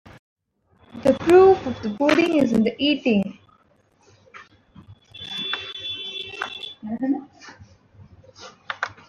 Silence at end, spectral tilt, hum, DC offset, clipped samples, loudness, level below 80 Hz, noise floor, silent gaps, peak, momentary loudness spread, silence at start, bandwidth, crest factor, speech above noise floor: 0.15 s; -5.5 dB/octave; none; under 0.1%; under 0.1%; -21 LUFS; -58 dBFS; -60 dBFS; none; -4 dBFS; 17 LU; 0.95 s; 10.5 kHz; 20 dB; 42 dB